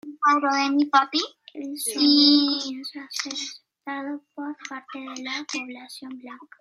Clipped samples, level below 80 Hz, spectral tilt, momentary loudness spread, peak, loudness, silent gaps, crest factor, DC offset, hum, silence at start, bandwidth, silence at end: under 0.1%; -84 dBFS; -0.5 dB/octave; 21 LU; -4 dBFS; -22 LUFS; none; 20 dB; under 0.1%; none; 0.05 s; 13.5 kHz; 0.15 s